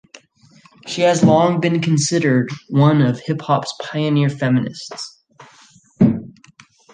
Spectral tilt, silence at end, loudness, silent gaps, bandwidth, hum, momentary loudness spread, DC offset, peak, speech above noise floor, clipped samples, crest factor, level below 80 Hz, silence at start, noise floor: -6 dB/octave; 0.65 s; -17 LUFS; none; 9.6 kHz; none; 15 LU; under 0.1%; -2 dBFS; 34 dB; under 0.1%; 16 dB; -56 dBFS; 0.85 s; -50 dBFS